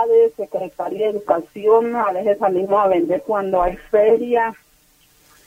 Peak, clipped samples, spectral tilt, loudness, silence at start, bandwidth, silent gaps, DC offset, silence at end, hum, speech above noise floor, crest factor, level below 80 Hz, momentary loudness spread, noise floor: -4 dBFS; under 0.1%; -7 dB/octave; -18 LUFS; 0 s; 15.5 kHz; none; under 0.1%; 0.95 s; none; 38 dB; 14 dB; -46 dBFS; 8 LU; -55 dBFS